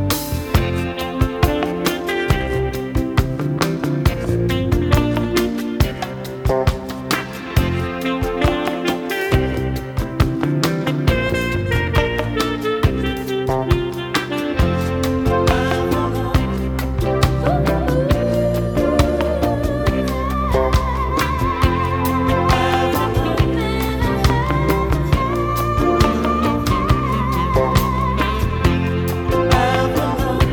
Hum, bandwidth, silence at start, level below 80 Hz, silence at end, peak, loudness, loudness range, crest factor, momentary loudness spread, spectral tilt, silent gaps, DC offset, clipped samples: none; over 20 kHz; 0 s; -26 dBFS; 0 s; 0 dBFS; -19 LUFS; 2 LU; 18 dB; 5 LU; -6 dB/octave; none; under 0.1%; under 0.1%